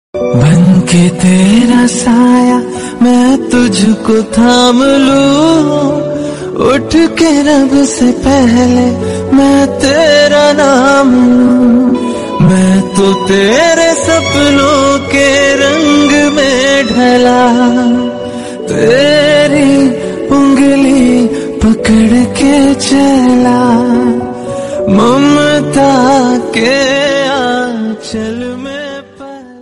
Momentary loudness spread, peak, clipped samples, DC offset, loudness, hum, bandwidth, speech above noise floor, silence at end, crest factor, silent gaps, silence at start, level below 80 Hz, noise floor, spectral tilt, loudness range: 9 LU; 0 dBFS; 0.2%; 1%; -8 LUFS; none; 11.5 kHz; 21 dB; 0 s; 8 dB; none; 0.15 s; -36 dBFS; -28 dBFS; -5 dB/octave; 2 LU